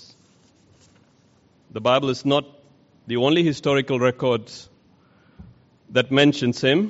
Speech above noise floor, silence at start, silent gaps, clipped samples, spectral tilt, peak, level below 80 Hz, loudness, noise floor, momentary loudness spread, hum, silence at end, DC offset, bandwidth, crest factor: 38 dB; 1.75 s; none; under 0.1%; -4 dB/octave; -4 dBFS; -62 dBFS; -21 LUFS; -58 dBFS; 10 LU; none; 0 s; under 0.1%; 8 kHz; 18 dB